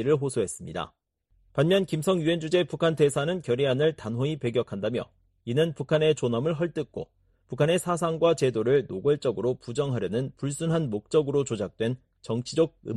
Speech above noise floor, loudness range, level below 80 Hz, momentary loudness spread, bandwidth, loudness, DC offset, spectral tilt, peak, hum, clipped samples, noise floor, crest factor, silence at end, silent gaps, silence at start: 40 dB; 3 LU; -60 dBFS; 11 LU; 12.5 kHz; -27 LUFS; under 0.1%; -6 dB/octave; -10 dBFS; none; under 0.1%; -66 dBFS; 16 dB; 0 s; none; 0 s